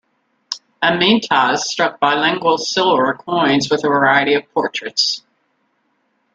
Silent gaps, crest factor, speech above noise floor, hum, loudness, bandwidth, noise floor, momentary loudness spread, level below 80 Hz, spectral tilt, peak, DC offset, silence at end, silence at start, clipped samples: none; 16 dB; 49 dB; none; -16 LUFS; 9.2 kHz; -65 dBFS; 7 LU; -60 dBFS; -3.5 dB/octave; 0 dBFS; under 0.1%; 1.15 s; 0.5 s; under 0.1%